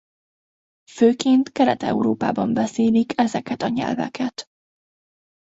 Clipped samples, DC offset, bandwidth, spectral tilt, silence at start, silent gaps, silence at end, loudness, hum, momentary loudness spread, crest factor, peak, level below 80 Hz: under 0.1%; under 0.1%; 8 kHz; -5.5 dB/octave; 0.95 s; none; 1.05 s; -21 LUFS; none; 8 LU; 18 dB; -4 dBFS; -60 dBFS